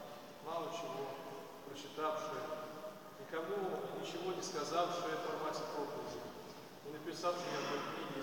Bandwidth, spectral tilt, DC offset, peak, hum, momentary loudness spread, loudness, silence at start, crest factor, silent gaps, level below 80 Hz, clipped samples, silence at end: 17 kHz; -4 dB/octave; under 0.1%; -24 dBFS; none; 12 LU; -42 LUFS; 0 s; 20 dB; none; -82 dBFS; under 0.1%; 0 s